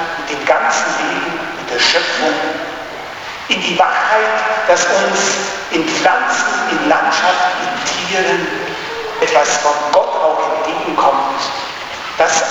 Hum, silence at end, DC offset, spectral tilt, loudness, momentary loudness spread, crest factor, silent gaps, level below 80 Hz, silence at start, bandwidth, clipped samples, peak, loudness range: none; 0 s; under 0.1%; -1.5 dB/octave; -14 LUFS; 10 LU; 14 dB; none; -54 dBFS; 0 s; 20 kHz; under 0.1%; 0 dBFS; 2 LU